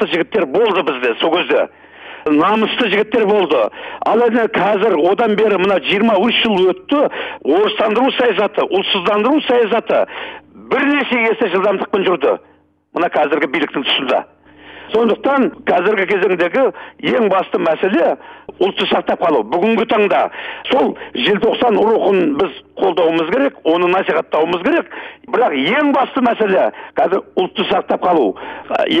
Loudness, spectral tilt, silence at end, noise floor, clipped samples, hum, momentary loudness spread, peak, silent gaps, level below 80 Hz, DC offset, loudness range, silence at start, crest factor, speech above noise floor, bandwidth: -15 LUFS; -6.5 dB/octave; 0 s; -39 dBFS; under 0.1%; none; 6 LU; -2 dBFS; none; -56 dBFS; under 0.1%; 2 LU; 0 s; 12 dB; 24 dB; 8 kHz